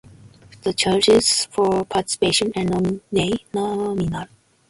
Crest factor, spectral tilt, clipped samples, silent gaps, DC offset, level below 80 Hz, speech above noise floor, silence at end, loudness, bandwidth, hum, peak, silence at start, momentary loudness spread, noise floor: 16 dB; -4 dB/octave; under 0.1%; none; under 0.1%; -48 dBFS; 26 dB; 0.45 s; -20 LUFS; 11.5 kHz; none; -4 dBFS; 0.65 s; 11 LU; -46 dBFS